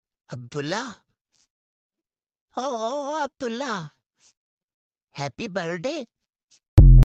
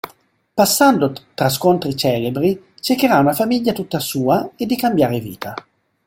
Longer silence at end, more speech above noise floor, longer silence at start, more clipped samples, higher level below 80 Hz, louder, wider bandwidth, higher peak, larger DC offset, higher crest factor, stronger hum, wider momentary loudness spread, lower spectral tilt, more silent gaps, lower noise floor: second, 0 s vs 0.45 s; first, over 61 dB vs 36 dB; first, 0.3 s vs 0.05 s; neither; first, -26 dBFS vs -54 dBFS; second, -25 LUFS vs -17 LUFS; second, 7.6 kHz vs 17 kHz; about the same, -4 dBFS vs -2 dBFS; neither; about the same, 18 dB vs 16 dB; neither; first, 19 LU vs 12 LU; first, -7 dB/octave vs -5 dB/octave; first, 1.21-1.25 s, 1.50-1.90 s, 2.41-2.48 s, 4.37-4.57 s, 4.63-4.68 s, 4.74-4.90 s, 6.68-6.77 s vs none; first, under -90 dBFS vs -53 dBFS